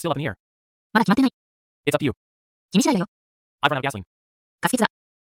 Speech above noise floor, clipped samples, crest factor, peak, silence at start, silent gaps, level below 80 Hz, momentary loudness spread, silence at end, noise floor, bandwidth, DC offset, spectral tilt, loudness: over 69 dB; under 0.1%; 24 dB; 0 dBFS; 0 s; 0.40-0.90 s, 1.33-1.83 s, 2.17-2.69 s, 3.08-3.58 s, 4.07-4.58 s; -60 dBFS; 12 LU; 0.5 s; under -90 dBFS; 16.5 kHz; under 0.1%; -5 dB/octave; -23 LUFS